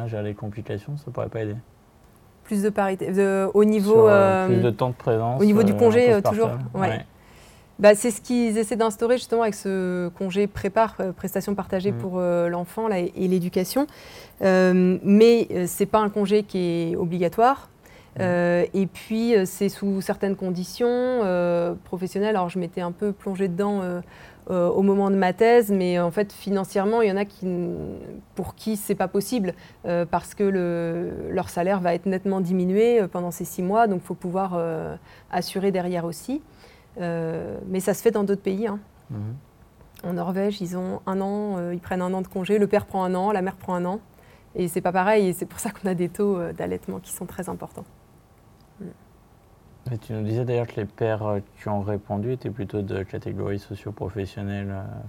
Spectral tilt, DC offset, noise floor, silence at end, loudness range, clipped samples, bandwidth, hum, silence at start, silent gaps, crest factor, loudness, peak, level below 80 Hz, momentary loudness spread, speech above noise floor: -6.5 dB/octave; under 0.1%; -53 dBFS; 0 s; 9 LU; under 0.1%; 17 kHz; none; 0 s; none; 20 dB; -23 LUFS; -4 dBFS; -56 dBFS; 14 LU; 31 dB